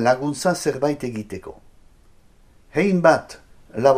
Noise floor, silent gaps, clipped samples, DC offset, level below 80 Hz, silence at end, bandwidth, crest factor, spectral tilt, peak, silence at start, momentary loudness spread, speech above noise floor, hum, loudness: -52 dBFS; none; under 0.1%; under 0.1%; -52 dBFS; 0 s; 15 kHz; 22 dB; -5.5 dB/octave; 0 dBFS; 0 s; 19 LU; 31 dB; none; -21 LUFS